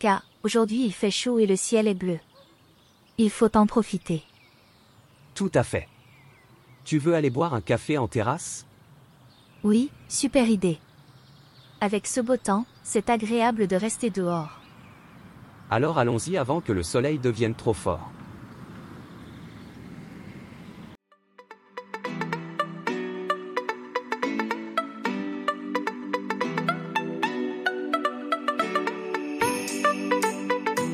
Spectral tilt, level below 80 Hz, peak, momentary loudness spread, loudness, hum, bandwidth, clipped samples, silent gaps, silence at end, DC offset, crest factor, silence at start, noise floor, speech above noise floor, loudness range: -5 dB/octave; -58 dBFS; -6 dBFS; 20 LU; -26 LUFS; none; 15.5 kHz; under 0.1%; none; 0 s; under 0.1%; 20 dB; 0 s; -58 dBFS; 34 dB; 9 LU